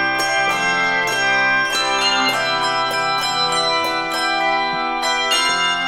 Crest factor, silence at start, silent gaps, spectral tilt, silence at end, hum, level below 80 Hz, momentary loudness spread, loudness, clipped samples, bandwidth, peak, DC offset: 14 dB; 0 s; none; -1 dB/octave; 0 s; none; -50 dBFS; 4 LU; -17 LUFS; under 0.1%; 17.5 kHz; -6 dBFS; under 0.1%